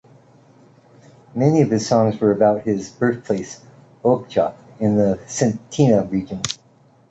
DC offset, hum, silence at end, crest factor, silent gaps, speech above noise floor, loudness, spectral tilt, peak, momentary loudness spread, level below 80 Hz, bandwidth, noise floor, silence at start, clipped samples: under 0.1%; none; 0.55 s; 18 dB; none; 35 dB; -19 LUFS; -6 dB/octave; -2 dBFS; 10 LU; -52 dBFS; 8.2 kHz; -53 dBFS; 1.35 s; under 0.1%